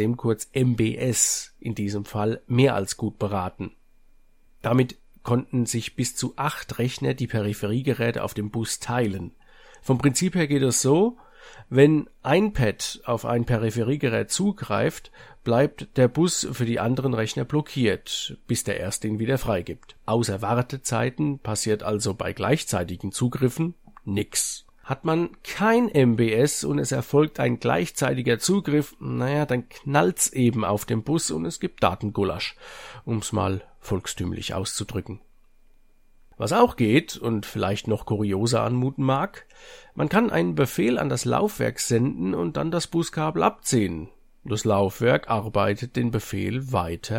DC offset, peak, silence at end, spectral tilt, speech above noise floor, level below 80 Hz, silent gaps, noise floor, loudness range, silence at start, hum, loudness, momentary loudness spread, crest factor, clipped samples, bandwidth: under 0.1%; -4 dBFS; 0 s; -5 dB/octave; 30 dB; -50 dBFS; none; -54 dBFS; 5 LU; 0 s; none; -24 LUFS; 9 LU; 20 dB; under 0.1%; 16.5 kHz